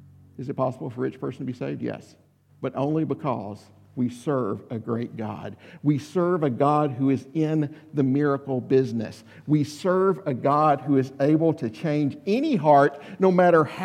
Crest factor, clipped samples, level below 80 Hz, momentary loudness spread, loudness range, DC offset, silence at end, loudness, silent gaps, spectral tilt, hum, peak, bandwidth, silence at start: 18 dB; under 0.1%; -72 dBFS; 14 LU; 8 LU; under 0.1%; 0 s; -24 LUFS; none; -8 dB/octave; none; -6 dBFS; 11.5 kHz; 0.4 s